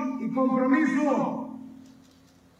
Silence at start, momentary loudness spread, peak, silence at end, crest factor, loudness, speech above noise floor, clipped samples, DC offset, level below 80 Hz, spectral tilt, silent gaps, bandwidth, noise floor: 0 s; 19 LU; -12 dBFS; 0.75 s; 16 dB; -25 LUFS; 33 dB; under 0.1%; under 0.1%; -76 dBFS; -7 dB/octave; none; 8.4 kHz; -57 dBFS